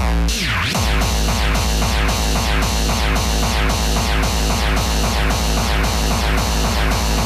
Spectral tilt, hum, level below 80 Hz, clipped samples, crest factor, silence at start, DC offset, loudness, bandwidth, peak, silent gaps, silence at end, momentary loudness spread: -4 dB/octave; none; -20 dBFS; under 0.1%; 10 dB; 0 s; under 0.1%; -18 LUFS; 15 kHz; -8 dBFS; none; 0 s; 0 LU